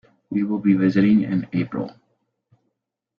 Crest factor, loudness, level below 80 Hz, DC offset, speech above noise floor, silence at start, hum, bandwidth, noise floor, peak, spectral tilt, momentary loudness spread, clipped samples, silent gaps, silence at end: 16 dB; -21 LUFS; -60 dBFS; under 0.1%; 59 dB; 0.3 s; none; 5.4 kHz; -78 dBFS; -6 dBFS; -9.5 dB/octave; 11 LU; under 0.1%; none; 1.3 s